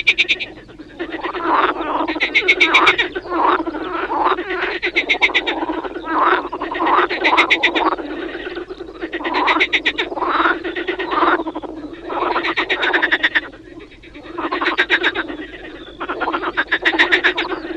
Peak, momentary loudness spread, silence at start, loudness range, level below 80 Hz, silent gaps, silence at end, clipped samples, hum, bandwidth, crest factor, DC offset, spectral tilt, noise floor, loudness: -2 dBFS; 15 LU; 0 s; 4 LU; -48 dBFS; none; 0 s; under 0.1%; none; 10 kHz; 18 dB; under 0.1%; -3 dB/octave; -38 dBFS; -17 LUFS